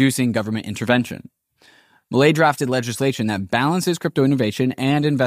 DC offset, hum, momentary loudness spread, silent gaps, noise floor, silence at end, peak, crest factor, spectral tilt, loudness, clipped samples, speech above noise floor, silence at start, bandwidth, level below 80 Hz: under 0.1%; none; 7 LU; none; -54 dBFS; 0 s; -4 dBFS; 16 dB; -5.5 dB/octave; -20 LUFS; under 0.1%; 35 dB; 0 s; 15.5 kHz; -60 dBFS